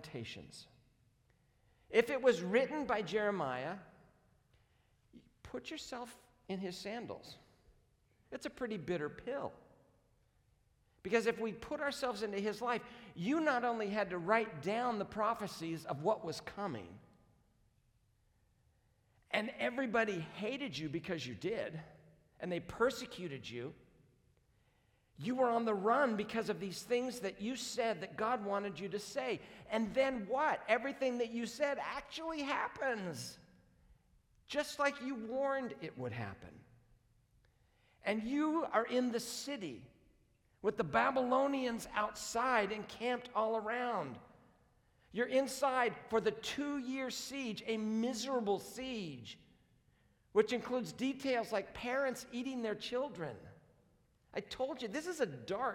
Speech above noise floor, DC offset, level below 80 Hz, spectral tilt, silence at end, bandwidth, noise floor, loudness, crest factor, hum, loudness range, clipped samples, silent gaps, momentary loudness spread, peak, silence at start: 36 dB; under 0.1%; -70 dBFS; -4.5 dB/octave; 0 s; 18 kHz; -74 dBFS; -38 LUFS; 22 dB; none; 8 LU; under 0.1%; none; 13 LU; -16 dBFS; 0 s